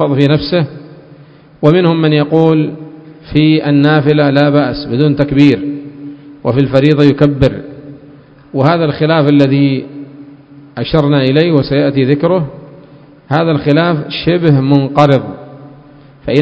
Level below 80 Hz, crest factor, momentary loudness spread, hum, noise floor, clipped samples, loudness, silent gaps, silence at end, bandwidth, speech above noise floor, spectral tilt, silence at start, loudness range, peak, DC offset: -40 dBFS; 12 dB; 17 LU; none; -39 dBFS; 0.6%; -11 LUFS; none; 0 s; 8 kHz; 29 dB; -9 dB/octave; 0 s; 2 LU; 0 dBFS; under 0.1%